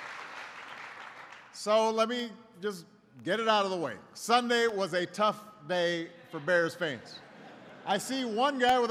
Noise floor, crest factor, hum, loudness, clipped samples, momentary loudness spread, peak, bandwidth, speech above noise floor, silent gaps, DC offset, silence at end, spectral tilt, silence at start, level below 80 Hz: -50 dBFS; 20 dB; none; -30 LUFS; under 0.1%; 19 LU; -12 dBFS; 15.5 kHz; 21 dB; none; under 0.1%; 0 s; -3.5 dB/octave; 0 s; -74 dBFS